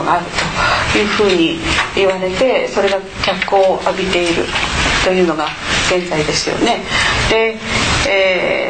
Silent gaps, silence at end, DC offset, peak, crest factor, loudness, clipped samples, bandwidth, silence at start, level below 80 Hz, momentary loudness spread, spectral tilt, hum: none; 0 s; 0.5%; -2 dBFS; 12 dB; -14 LUFS; under 0.1%; 9.2 kHz; 0 s; -32 dBFS; 4 LU; -3.5 dB/octave; none